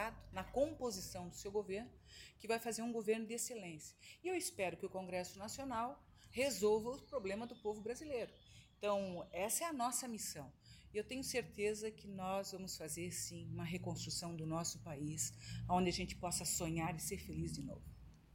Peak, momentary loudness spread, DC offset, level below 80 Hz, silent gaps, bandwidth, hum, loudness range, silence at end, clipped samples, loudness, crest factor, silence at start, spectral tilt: -24 dBFS; 11 LU; under 0.1%; -62 dBFS; none; 17 kHz; none; 3 LU; 0.1 s; under 0.1%; -42 LUFS; 18 dB; 0 s; -4 dB/octave